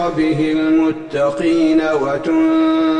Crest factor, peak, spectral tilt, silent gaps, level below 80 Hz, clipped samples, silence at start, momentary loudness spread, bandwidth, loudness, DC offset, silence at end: 10 dB; -4 dBFS; -6.5 dB/octave; none; -46 dBFS; under 0.1%; 0 s; 4 LU; 9.2 kHz; -16 LUFS; under 0.1%; 0 s